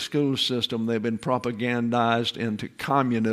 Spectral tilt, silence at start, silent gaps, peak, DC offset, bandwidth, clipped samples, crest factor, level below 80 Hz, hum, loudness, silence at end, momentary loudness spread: -5.5 dB/octave; 0 s; none; -6 dBFS; under 0.1%; 14.5 kHz; under 0.1%; 18 dB; -64 dBFS; none; -25 LUFS; 0 s; 5 LU